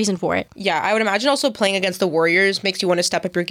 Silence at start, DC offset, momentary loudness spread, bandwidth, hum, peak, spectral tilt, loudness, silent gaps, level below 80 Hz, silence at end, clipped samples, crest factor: 0 s; under 0.1%; 6 LU; 16.5 kHz; none; -4 dBFS; -3.5 dB/octave; -19 LUFS; none; -62 dBFS; 0 s; under 0.1%; 14 dB